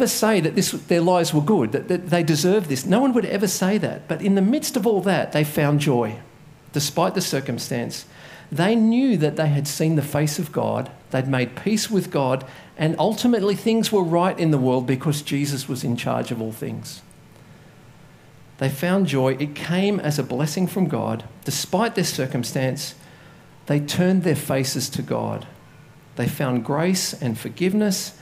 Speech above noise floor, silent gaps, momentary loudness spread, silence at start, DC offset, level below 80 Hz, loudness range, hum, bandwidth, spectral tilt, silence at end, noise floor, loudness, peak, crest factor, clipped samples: 26 dB; none; 9 LU; 0 s; under 0.1%; -60 dBFS; 5 LU; none; 16 kHz; -5.5 dB/octave; 0.1 s; -47 dBFS; -22 LUFS; -4 dBFS; 18 dB; under 0.1%